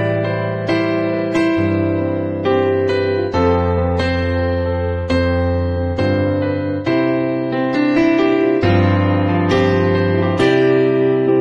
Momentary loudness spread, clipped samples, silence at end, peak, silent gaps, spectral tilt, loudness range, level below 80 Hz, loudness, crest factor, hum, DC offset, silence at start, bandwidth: 5 LU; under 0.1%; 0 s; -2 dBFS; none; -8 dB/octave; 3 LU; -36 dBFS; -16 LUFS; 14 dB; none; under 0.1%; 0 s; 9 kHz